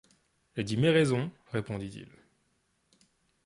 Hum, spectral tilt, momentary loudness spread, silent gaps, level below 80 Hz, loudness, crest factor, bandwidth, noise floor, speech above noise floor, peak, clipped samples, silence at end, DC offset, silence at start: none; -6.5 dB/octave; 18 LU; none; -62 dBFS; -30 LUFS; 20 dB; 11.5 kHz; -74 dBFS; 45 dB; -12 dBFS; under 0.1%; 1.4 s; under 0.1%; 0.55 s